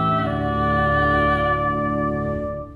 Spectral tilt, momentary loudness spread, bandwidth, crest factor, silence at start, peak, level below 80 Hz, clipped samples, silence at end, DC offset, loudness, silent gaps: -8.5 dB/octave; 6 LU; 11.5 kHz; 12 dB; 0 s; -8 dBFS; -36 dBFS; under 0.1%; 0 s; under 0.1%; -20 LUFS; none